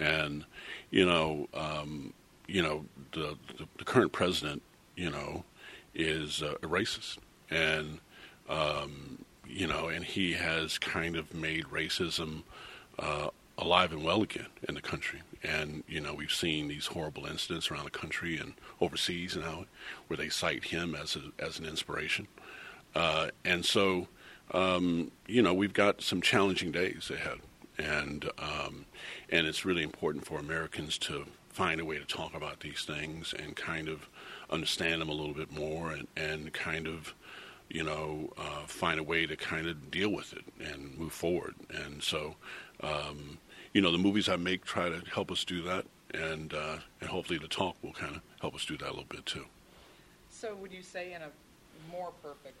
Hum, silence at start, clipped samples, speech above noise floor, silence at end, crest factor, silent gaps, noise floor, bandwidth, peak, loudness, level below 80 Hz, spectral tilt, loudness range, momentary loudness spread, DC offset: none; 0 s; under 0.1%; 24 dB; 0.1 s; 26 dB; none; -59 dBFS; 15.5 kHz; -8 dBFS; -34 LUFS; -58 dBFS; -4 dB/octave; 7 LU; 16 LU; under 0.1%